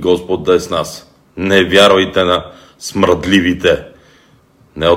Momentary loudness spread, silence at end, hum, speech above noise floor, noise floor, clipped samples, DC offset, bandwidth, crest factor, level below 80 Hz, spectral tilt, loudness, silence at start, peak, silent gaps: 16 LU; 0 s; none; 36 dB; -49 dBFS; under 0.1%; under 0.1%; 16.5 kHz; 14 dB; -40 dBFS; -4.5 dB/octave; -13 LUFS; 0 s; 0 dBFS; none